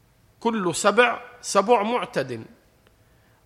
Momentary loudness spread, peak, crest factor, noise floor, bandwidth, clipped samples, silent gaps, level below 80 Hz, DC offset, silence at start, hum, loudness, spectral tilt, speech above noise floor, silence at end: 13 LU; -4 dBFS; 20 dB; -58 dBFS; 14.5 kHz; under 0.1%; none; -64 dBFS; under 0.1%; 0.4 s; none; -22 LUFS; -3.5 dB/octave; 36 dB; 1 s